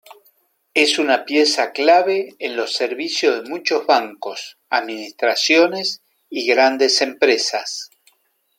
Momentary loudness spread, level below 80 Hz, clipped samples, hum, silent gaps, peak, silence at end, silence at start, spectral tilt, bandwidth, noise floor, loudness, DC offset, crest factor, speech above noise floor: 14 LU; -76 dBFS; under 0.1%; none; none; -2 dBFS; 0.7 s; 0.75 s; -1.5 dB/octave; 16.5 kHz; -62 dBFS; -17 LUFS; under 0.1%; 18 dB; 44 dB